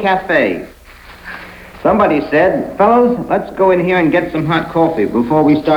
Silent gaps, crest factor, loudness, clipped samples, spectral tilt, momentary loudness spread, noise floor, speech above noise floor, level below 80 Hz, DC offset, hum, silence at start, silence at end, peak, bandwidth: none; 12 dB; -13 LUFS; under 0.1%; -7.5 dB/octave; 18 LU; -37 dBFS; 24 dB; -42 dBFS; under 0.1%; none; 0 s; 0 s; 0 dBFS; 19.5 kHz